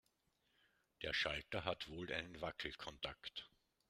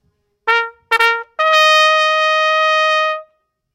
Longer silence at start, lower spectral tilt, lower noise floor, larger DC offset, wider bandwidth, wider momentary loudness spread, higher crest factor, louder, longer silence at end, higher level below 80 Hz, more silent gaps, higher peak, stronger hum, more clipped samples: first, 1 s vs 0.45 s; first, -4 dB/octave vs 3 dB/octave; first, -82 dBFS vs -59 dBFS; neither; about the same, 15 kHz vs 16.5 kHz; about the same, 11 LU vs 9 LU; first, 24 dB vs 16 dB; second, -45 LUFS vs -13 LUFS; about the same, 0.45 s vs 0.5 s; about the same, -66 dBFS vs -64 dBFS; neither; second, -24 dBFS vs 0 dBFS; neither; second, under 0.1% vs 0.1%